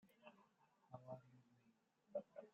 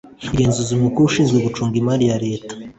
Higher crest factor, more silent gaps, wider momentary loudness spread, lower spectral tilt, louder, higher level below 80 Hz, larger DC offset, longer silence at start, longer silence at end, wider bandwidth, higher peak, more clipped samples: first, 22 dB vs 14 dB; neither; first, 14 LU vs 8 LU; about the same, -7 dB/octave vs -6 dB/octave; second, -56 LUFS vs -18 LUFS; second, under -90 dBFS vs -42 dBFS; neither; about the same, 0.05 s vs 0.05 s; about the same, 0.05 s vs 0.05 s; second, 7.2 kHz vs 8.4 kHz; second, -36 dBFS vs -4 dBFS; neither